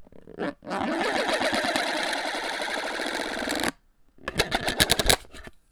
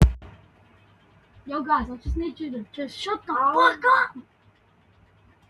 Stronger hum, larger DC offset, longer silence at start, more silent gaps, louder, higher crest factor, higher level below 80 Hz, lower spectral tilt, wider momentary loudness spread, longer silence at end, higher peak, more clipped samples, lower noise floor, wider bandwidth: neither; neither; about the same, 0 s vs 0 s; neither; about the same, -26 LUFS vs -24 LUFS; first, 28 dB vs 22 dB; second, -44 dBFS vs -34 dBFS; second, -2.5 dB/octave vs -6 dB/octave; about the same, 13 LU vs 15 LU; second, 0.15 s vs 1.3 s; first, 0 dBFS vs -4 dBFS; neither; about the same, -56 dBFS vs -59 dBFS; first, over 20 kHz vs 11.5 kHz